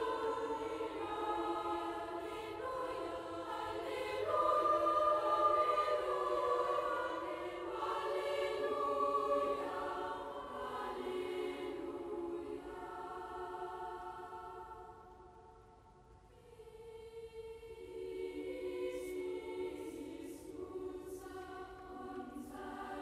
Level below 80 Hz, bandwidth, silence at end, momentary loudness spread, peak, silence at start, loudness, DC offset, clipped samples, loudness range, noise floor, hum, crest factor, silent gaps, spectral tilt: -66 dBFS; 15.5 kHz; 0 s; 18 LU; -20 dBFS; 0 s; -39 LUFS; under 0.1%; under 0.1%; 16 LU; -61 dBFS; none; 20 dB; none; -5 dB/octave